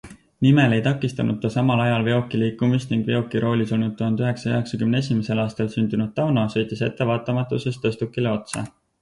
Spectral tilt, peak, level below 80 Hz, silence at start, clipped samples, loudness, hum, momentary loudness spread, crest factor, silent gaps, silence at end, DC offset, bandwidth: -7 dB/octave; -4 dBFS; -54 dBFS; 0.05 s; under 0.1%; -22 LUFS; none; 6 LU; 16 dB; none; 0.3 s; under 0.1%; 11.5 kHz